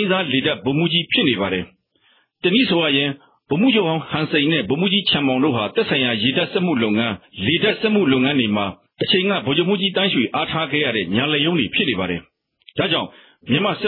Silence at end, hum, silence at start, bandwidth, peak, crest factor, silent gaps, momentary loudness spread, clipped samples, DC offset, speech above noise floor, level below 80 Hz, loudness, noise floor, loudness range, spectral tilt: 0 s; none; 0 s; 4.9 kHz; -4 dBFS; 16 dB; none; 7 LU; under 0.1%; under 0.1%; 41 dB; -58 dBFS; -18 LUFS; -60 dBFS; 2 LU; -9 dB/octave